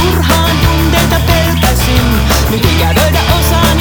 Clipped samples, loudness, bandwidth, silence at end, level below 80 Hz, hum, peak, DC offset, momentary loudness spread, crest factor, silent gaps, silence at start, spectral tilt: under 0.1%; -10 LUFS; over 20 kHz; 0 s; -14 dBFS; none; 0 dBFS; under 0.1%; 1 LU; 10 dB; none; 0 s; -4.5 dB/octave